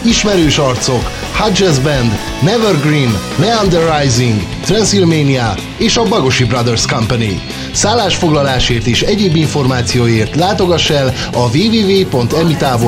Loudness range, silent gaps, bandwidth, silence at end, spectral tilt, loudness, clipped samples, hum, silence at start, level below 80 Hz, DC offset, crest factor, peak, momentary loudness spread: 1 LU; none; 16.5 kHz; 0 s; -4.5 dB/octave; -12 LUFS; under 0.1%; none; 0 s; -28 dBFS; under 0.1%; 12 dB; 0 dBFS; 4 LU